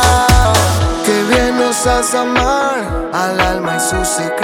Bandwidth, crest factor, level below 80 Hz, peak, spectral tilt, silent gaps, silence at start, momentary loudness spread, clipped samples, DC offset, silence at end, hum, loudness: 18.5 kHz; 12 dB; -22 dBFS; 0 dBFS; -4 dB/octave; none; 0 s; 6 LU; under 0.1%; under 0.1%; 0 s; none; -13 LUFS